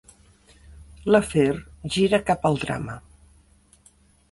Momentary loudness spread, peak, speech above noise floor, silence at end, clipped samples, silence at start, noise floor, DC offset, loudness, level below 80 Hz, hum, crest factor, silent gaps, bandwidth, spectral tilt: 13 LU; -6 dBFS; 36 dB; 1.35 s; under 0.1%; 0.7 s; -57 dBFS; under 0.1%; -23 LUFS; -48 dBFS; none; 20 dB; none; 11.5 kHz; -5.5 dB/octave